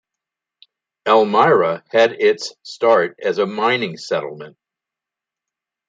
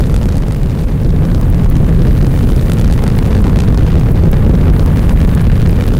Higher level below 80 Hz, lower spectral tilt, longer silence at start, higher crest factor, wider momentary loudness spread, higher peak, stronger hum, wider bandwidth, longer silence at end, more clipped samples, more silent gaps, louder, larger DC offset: second, -72 dBFS vs -12 dBFS; second, -4.5 dB/octave vs -8.5 dB/octave; first, 1.05 s vs 0 s; first, 18 dB vs 6 dB; first, 12 LU vs 3 LU; about the same, -2 dBFS vs -2 dBFS; neither; second, 9 kHz vs 16 kHz; first, 1.4 s vs 0 s; neither; neither; second, -17 LUFS vs -11 LUFS; neither